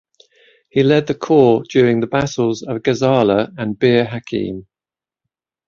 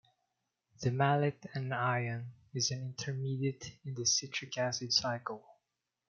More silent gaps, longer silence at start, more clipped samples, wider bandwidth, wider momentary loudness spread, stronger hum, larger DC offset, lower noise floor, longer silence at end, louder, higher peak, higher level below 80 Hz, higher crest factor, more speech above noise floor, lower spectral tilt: neither; about the same, 0.75 s vs 0.8 s; neither; about the same, 7.4 kHz vs 7.2 kHz; second, 10 LU vs 13 LU; neither; neither; about the same, under -90 dBFS vs -88 dBFS; first, 1.05 s vs 0.55 s; first, -16 LUFS vs -34 LUFS; first, 0 dBFS vs -14 dBFS; first, -52 dBFS vs -74 dBFS; second, 16 dB vs 22 dB; first, over 75 dB vs 53 dB; first, -6.5 dB/octave vs -3.5 dB/octave